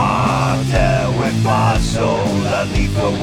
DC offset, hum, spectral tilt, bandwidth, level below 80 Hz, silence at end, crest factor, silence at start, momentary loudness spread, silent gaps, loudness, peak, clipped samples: under 0.1%; none; -6 dB/octave; 14.5 kHz; -26 dBFS; 0 s; 14 dB; 0 s; 3 LU; none; -16 LUFS; -2 dBFS; under 0.1%